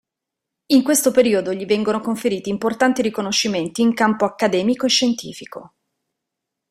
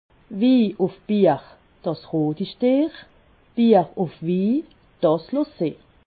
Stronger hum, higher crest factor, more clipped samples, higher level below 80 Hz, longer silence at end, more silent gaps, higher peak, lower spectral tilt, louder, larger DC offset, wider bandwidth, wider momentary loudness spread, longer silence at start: neither; about the same, 18 dB vs 18 dB; neither; about the same, -60 dBFS vs -60 dBFS; first, 1.05 s vs 0.35 s; neither; about the same, -2 dBFS vs -4 dBFS; second, -3.5 dB/octave vs -12 dB/octave; first, -18 LUFS vs -22 LUFS; neither; first, 16 kHz vs 4.8 kHz; second, 7 LU vs 11 LU; first, 0.7 s vs 0.3 s